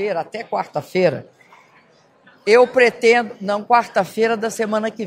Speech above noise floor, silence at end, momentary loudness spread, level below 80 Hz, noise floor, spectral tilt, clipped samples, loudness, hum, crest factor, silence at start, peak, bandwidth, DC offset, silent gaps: 36 dB; 0 s; 11 LU; -70 dBFS; -53 dBFS; -4.5 dB/octave; under 0.1%; -18 LUFS; none; 18 dB; 0 s; 0 dBFS; 16 kHz; under 0.1%; none